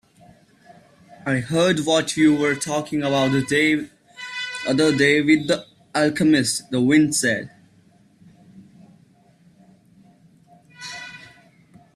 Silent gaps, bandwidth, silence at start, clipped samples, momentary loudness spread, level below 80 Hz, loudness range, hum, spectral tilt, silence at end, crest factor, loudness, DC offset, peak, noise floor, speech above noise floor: none; 13 kHz; 1.25 s; under 0.1%; 18 LU; -60 dBFS; 5 LU; none; -4.5 dB/octave; 0.7 s; 18 dB; -20 LUFS; under 0.1%; -4 dBFS; -55 dBFS; 36 dB